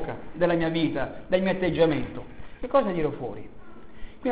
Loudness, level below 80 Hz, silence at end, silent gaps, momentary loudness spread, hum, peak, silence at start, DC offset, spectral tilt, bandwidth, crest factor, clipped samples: -26 LUFS; -48 dBFS; 0 s; none; 17 LU; none; -8 dBFS; 0 s; 1%; -10.5 dB/octave; 4 kHz; 18 dB; under 0.1%